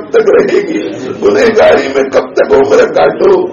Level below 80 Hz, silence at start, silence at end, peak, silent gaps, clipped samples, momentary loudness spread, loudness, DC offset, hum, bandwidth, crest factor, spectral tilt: -42 dBFS; 0 s; 0 s; 0 dBFS; none; 0.4%; 6 LU; -8 LUFS; under 0.1%; none; 7.4 kHz; 8 dB; -5 dB/octave